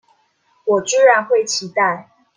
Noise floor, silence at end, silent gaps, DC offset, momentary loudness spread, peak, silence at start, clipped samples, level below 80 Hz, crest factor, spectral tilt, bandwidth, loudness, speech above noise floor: -61 dBFS; 0.35 s; none; under 0.1%; 10 LU; -2 dBFS; 0.65 s; under 0.1%; -70 dBFS; 16 dB; -2 dB/octave; 10 kHz; -16 LUFS; 45 dB